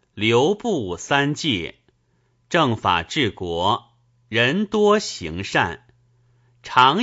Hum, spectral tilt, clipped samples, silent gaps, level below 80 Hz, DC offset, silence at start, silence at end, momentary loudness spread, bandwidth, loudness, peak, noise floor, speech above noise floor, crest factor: none; -4.5 dB/octave; under 0.1%; none; -52 dBFS; under 0.1%; 0.15 s; 0 s; 8 LU; 8 kHz; -20 LUFS; 0 dBFS; -64 dBFS; 45 dB; 22 dB